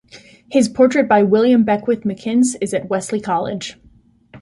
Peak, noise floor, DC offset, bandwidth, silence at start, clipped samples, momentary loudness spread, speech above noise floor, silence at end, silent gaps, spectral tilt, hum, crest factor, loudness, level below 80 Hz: -2 dBFS; -51 dBFS; under 0.1%; 11.5 kHz; 0.15 s; under 0.1%; 9 LU; 35 dB; 0.05 s; none; -5.5 dB/octave; none; 16 dB; -16 LUFS; -56 dBFS